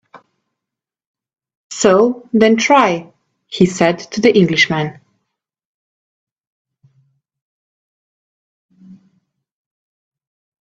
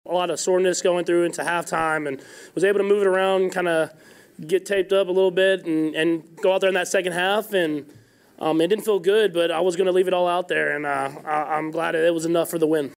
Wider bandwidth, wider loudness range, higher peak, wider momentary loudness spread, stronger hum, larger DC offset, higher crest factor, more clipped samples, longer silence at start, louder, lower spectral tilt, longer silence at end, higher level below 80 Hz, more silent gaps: second, 9 kHz vs 16 kHz; first, 6 LU vs 1 LU; first, 0 dBFS vs -8 dBFS; first, 13 LU vs 6 LU; neither; neither; first, 18 dB vs 12 dB; neither; about the same, 0.15 s vs 0.05 s; first, -13 LUFS vs -22 LUFS; about the same, -5 dB/octave vs -4 dB/octave; first, 1.75 s vs 0.05 s; first, -58 dBFS vs -68 dBFS; first, 1.07-1.14 s, 1.55-1.70 s, 5.65-6.65 s, 7.42-8.69 s vs none